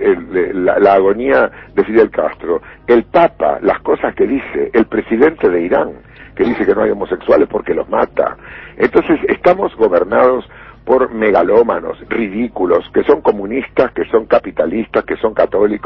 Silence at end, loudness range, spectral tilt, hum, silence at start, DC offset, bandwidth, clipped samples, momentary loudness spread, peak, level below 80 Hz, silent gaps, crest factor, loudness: 0.05 s; 2 LU; -8.5 dB/octave; none; 0 s; under 0.1%; 5.8 kHz; under 0.1%; 7 LU; 0 dBFS; -42 dBFS; none; 14 dB; -14 LUFS